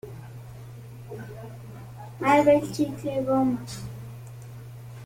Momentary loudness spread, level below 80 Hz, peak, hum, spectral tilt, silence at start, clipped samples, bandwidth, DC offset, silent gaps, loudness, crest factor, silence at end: 22 LU; -56 dBFS; -8 dBFS; none; -6.5 dB/octave; 0.05 s; under 0.1%; 16.5 kHz; under 0.1%; none; -24 LUFS; 20 dB; 0 s